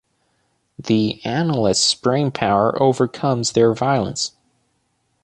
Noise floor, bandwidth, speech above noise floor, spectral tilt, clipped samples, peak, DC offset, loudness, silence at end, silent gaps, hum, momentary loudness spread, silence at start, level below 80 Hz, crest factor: -67 dBFS; 11.5 kHz; 50 dB; -4.5 dB/octave; under 0.1%; -2 dBFS; under 0.1%; -18 LUFS; 0.95 s; none; none; 6 LU; 0.8 s; -52 dBFS; 18 dB